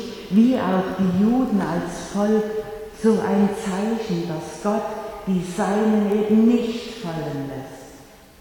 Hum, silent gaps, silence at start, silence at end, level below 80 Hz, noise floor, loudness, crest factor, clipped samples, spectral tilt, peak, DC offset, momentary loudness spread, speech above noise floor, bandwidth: none; none; 0 s; 0.35 s; -50 dBFS; -45 dBFS; -22 LUFS; 16 dB; under 0.1%; -7 dB/octave; -6 dBFS; under 0.1%; 12 LU; 25 dB; 18 kHz